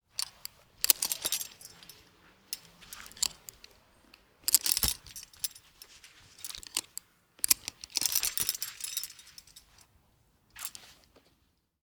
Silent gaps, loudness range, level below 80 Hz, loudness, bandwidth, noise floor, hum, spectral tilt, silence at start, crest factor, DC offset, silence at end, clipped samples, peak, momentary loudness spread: none; 6 LU; -58 dBFS; -31 LUFS; over 20 kHz; -72 dBFS; none; 1 dB/octave; 0.2 s; 36 dB; under 0.1%; 0.9 s; under 0.1%; 0 dBFS; 24 LU